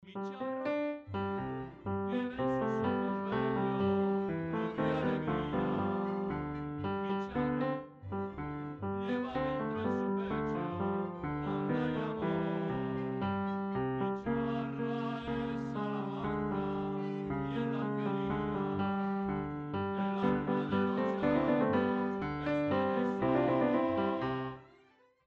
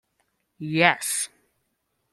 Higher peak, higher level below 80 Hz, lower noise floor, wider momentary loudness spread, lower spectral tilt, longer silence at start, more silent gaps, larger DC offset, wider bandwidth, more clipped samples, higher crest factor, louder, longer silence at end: second, -18 dBFS vs -2 dBFS; first, -58 dBFS vs -70 dBFS; second, -66 dBFS vs -75 dBFS; second, 7 LU vs 14 LU; first, -9 dB/octave vs -3 dB/octave; second, 0 s vs 0.6 s; neither; neither; second, 6.8 kHz vs 16 kHz; neither; second, 16 dB vs 26 dB; second, -34 LUFS vs -23 LUFS; second, 0.6 s vs 0.85 s